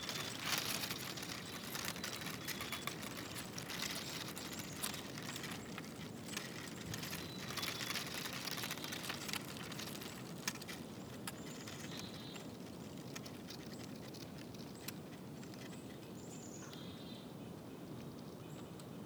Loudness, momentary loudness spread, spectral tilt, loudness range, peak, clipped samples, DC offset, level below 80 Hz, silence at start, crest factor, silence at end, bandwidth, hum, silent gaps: -45 LUFS; 10 LU; -3 dB/octave; 8 LU; -20 dBFS; under 0.1%; under 0.1%; -72 dBFS; 0 s; 26 dB; 0 s; over 20 kHz; none; none